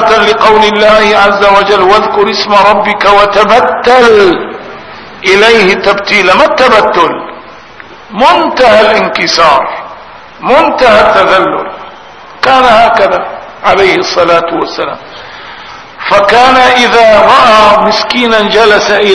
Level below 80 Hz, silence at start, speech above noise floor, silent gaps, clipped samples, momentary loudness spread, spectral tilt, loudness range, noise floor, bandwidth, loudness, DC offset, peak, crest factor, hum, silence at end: -36 dBFS; 0 s; 25 dB; none; 6%; 17 LU; -3.5 dB/octave; 3 LU; -30 dBFS; 11 kHz; -5 LUFS; under 0.1%; 0 dBFS; 6 dB; none; 0 s